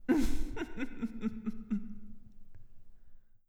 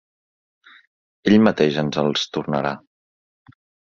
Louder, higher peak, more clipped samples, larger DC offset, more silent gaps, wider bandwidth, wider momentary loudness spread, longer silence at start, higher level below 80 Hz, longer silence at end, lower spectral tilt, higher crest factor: second, -38 LUFS vs -19 LUFS; second, -18 dBFS vs 0 dBFS; neither; neither; neither; first, 13 kHz vs 7.2 kHz; first, 20 LU vs 11 LU; second, 0 s vs 1.25 s; first, -42 dBFS vs -58 dBFS; second, 0.3 s vs 1.15 s; about the same, -6 dB/octave vs -6 dB/octave; second, 16 dB vs 22 dB